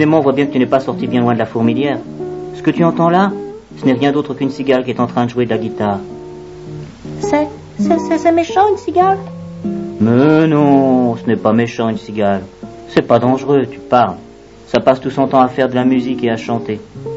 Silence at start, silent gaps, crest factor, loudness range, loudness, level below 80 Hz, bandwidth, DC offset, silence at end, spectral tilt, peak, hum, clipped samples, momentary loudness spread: 0 s; none; 14 dB; 5 LU; -14 LUFS; -48 dBFS; 8 kHz; under 0.1%; 0 s; -7.5 dB/octave; 0 dBFS; none; under 0.1%; 14 LU